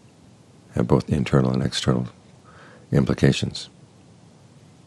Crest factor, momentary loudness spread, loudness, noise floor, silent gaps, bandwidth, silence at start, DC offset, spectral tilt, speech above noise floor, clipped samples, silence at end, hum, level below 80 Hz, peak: 22 dB; 12 LU; -22 LUFS; -51 dBFS; none; 11.5 kHz; 0.75 s; under 0.1%; -6.5 dB/octave; 30 dB; under 0.1%; 1.2 s; none; -44 dBFS; -2 dBFS